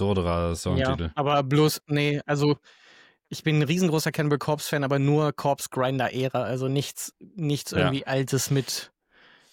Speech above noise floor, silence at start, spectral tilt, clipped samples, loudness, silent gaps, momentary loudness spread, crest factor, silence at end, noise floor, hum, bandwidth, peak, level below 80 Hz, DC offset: 33 dB; 0 s; -5.5 dB/octave; under 0.1%; -25 LUFS; none; 8 LU; 18 dB; 0.65 s; -58 dBFS; none; 17 kHz; -8 dBFS; -48 dBFS; under 0.1%